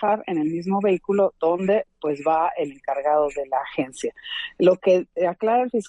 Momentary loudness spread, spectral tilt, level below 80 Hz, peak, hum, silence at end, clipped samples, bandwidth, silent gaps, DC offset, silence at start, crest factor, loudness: 9 LU; -6 dB/octave; -62 dBFS; -6 dBFS; none; 0 s; under 0.1%; 11 kHz; none; under 0.1%; 0 s; 16 dB; -23 LUFS